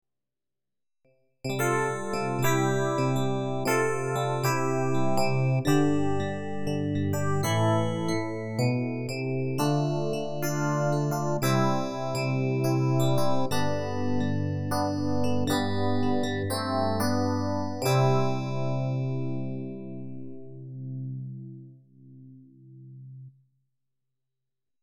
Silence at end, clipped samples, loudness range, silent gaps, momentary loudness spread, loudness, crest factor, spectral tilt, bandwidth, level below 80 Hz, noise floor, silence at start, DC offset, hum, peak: 1.5 s; under 0.1%; 11 LU; none; 12 LU; -27 LUFS; 16 dB; -6 dB/octave; 18 kHz; -58 dBFS; under -90 dBFS; 1.45 s; under 0.1%; none; -12 dBFS